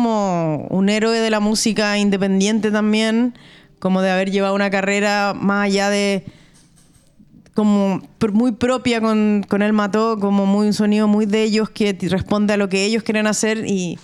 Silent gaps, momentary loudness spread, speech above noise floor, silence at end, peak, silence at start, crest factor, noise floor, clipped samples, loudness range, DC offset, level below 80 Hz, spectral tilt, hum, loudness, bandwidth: none; 4 LU; 34 dB; 0.05 s; -4 dBFS; 0 s; 14 dB; -51 dBFS; under 0.1%; 3 LU; under 0.1%; -52 dBFS; -5 dB/octave; none; -18 LUFS; 12.5 kHz